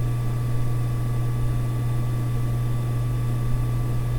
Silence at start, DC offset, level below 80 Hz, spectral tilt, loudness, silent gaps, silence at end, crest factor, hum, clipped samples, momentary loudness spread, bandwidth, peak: 0 s; under 0.1%; -30 dBFS; -7.5 dB/octave; -26 LUFS; none; 0 s; 12 dB; 60 Hz at -25 dBFS; under 0.1%; 0 LU; 18 kHz; -12 dBFS